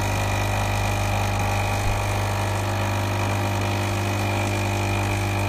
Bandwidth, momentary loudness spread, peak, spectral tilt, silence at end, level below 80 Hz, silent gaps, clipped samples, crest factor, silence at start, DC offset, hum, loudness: 15.5 kHz; 1 LU; -12 dBFS; -5 dB/octave; 0 s; -34 dBFS; none; under 0.1%; 12 dB; 0 s; under 0.1%; 50 Hz at -25 dBFS; -24 LUFS